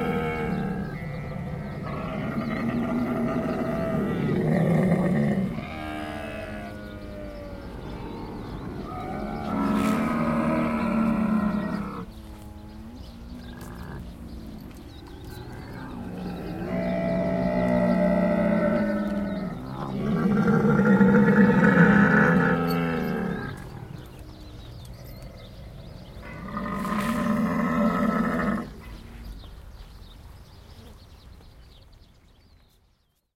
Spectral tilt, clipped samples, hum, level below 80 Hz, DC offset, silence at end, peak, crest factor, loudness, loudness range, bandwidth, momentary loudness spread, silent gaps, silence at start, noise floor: -8 dB/octave; under 0.1%; none; -44 dBFS; under 0.1%; 1.4 s; -6 dBFS; 20 dB; -25 LUFS; 18 LU; 15.5 kHz; 23 LU; none; 0 s; -67 dBFS